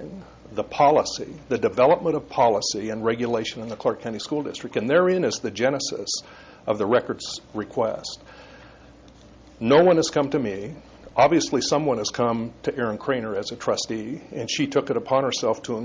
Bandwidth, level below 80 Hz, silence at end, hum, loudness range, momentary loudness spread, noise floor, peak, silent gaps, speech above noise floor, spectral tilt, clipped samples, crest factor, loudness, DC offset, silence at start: 7.6 kHz; -56 dBFS; 0 s; none; 5 LU; 13 LU; -48 dBFS; -6 dBFS; none; 25 dB; -4.5 dB/octave; under 0.1%; 18 dB; -23 LUFS; under 0.1%; 0 s